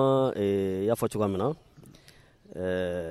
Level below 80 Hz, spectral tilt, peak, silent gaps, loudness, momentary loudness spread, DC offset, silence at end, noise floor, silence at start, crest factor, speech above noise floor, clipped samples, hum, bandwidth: -60 dBFS; -7 dB/octave; -12 dBFS; none; -28 LUFS; 10 LU; under 0.1%; 0 s; -56 dBFS; 0 s; 16 dB; 29 dB; under 0.1%; none; 15 kHz